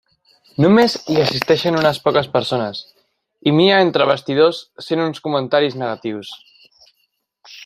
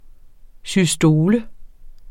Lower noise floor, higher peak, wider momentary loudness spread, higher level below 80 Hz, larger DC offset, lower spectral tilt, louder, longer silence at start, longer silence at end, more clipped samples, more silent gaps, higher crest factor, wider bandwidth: first, -68 dBFS vs -42 dBFS; first, 0 dBFS vs -4 dBFS; first, 14 LU vs 8 LU; second, -58 dBFS vs -42 dBFS; neither; about the same, -6 dB/octave vs -5.5 dB/octave; about the same, -17 LUFS vs -17 LUFS; first, 0.6 s vs 0.25 s; about the same, 0 s vs 0 s; neither; neither; about the same, 18 dB vs 16 dB; about the same, 15.5 kHz vs 16.5 kHz